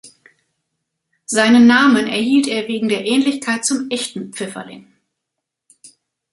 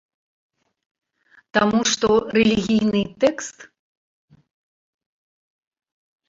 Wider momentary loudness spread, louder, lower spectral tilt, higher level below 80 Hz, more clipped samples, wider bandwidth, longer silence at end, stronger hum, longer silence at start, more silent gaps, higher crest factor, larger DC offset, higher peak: first, 17 LU vs 6 LU; first, -15 LUFS vs -19 LUFS; about the same, -3 dB/octave vs -4 dB/octave; second, -62 dBFS vs -54 dBFS; neither; first, 11.5 kHz vs 7.8 kHz; second, 1.5 s vs 2.65 s; neither; second, 0.05 s vs 1.55 s; neither; about the same, 18 dB vs 22 dB; neither; about the same, 0 dBFS vs -2 dBFS